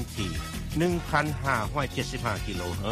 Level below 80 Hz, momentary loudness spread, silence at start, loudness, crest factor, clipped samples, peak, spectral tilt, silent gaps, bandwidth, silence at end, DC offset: -40 dBFS; 6 LU; 0 s; -29 LUFS; 20 dB; under 0.1%; -8 dBFS; -5 dB/octave; none; 15.5 kHz; 0 s; under 0.1%